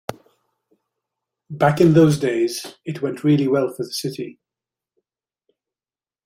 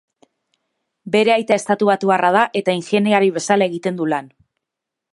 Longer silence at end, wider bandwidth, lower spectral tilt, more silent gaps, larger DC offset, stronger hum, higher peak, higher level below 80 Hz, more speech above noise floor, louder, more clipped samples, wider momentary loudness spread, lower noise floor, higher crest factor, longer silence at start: first, 1.95 s vs 0.85 s; first, 16 kHz vs 11.5 kHz; first, -6.5 dB/octave vs -5 dB/octave; neither; neither; neither; about the same, -2 dBFS vs 0 dBFS; first, -58 dBFS vs -70 dBFS; first, over 72 dB vs 66 dB; about the same, -19 LUFS vs -17 LUFS; neither; first, 19 LU vs 7 LU; first, under -90 dBFS vs -83 dBFS; about the same, 18 dB vs 18 dB; second, 0.1 s vs 1.05 s